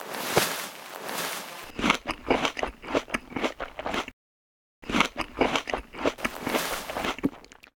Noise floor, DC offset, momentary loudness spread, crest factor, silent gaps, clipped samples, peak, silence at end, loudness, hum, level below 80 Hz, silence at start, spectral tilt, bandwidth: under -90 dBFS; under 0.1%; 10 LU; 28 dB; 4.13-4.82 s; under 0.1%; -2 dBFS; 0.3 s; -29 LUFS; none; -50 dBFS; 0 s; -3 dB/octave; over 20 kHz